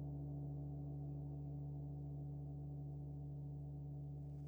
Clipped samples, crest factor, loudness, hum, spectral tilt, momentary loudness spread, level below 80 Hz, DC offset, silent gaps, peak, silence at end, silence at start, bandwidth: under 0.1%; 10 dB; -49 LUFS; none; -12 dB/octave; 2 LU; -60 dBFS; under 0.1%; none; -38 dBFS; 0 s; 0 s; over 20 kHz